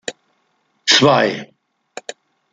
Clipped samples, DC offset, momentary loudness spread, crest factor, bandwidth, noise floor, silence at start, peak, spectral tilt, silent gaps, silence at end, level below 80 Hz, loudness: under 0.1%; under 0.1%; 23 LU; 20 dB; 10 kHz; -65 dBFS; 0.1 s; 0 dBFS; -3 dB/octave; none; 1.1 s; -62 dBFS; -14 LUFS